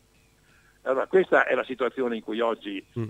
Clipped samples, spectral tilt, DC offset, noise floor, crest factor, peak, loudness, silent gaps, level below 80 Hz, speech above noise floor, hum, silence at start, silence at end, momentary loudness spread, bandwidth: under 0.1%; -6.5 dB/octave; under 0.1%; -61 dBFS; 20 dB; -6 dBFS; -26 LUFS; none; -66 dBFS; 36 dB; none; 0.85 s; 0 s; 12 LU; 9 kHz